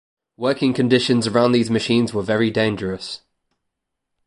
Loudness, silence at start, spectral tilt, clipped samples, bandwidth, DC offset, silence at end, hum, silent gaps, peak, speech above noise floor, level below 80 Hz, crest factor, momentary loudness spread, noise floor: -19 LUFS; 0.4 s; -5.5 dB/octave; under 0.1%; 11.5 kHz; under 0.1%; 1.1 s; none; none; -2 dBFS; 60 dB; -54 dBFS; 18 dB; 10 LU; -79 dBFS